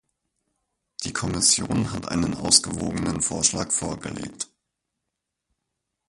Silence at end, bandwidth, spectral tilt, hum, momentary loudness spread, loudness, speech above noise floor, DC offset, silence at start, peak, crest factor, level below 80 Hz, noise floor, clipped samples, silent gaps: 1.65 s; 11.5 kHz; -2.5 dB/octave; none; 16 LU; -22 LUFS; 58 dB; under 0.1%; 1 s; -2 dBFS; 26 dB; -48 dBFS; -83 dBFS; under 0.1%; none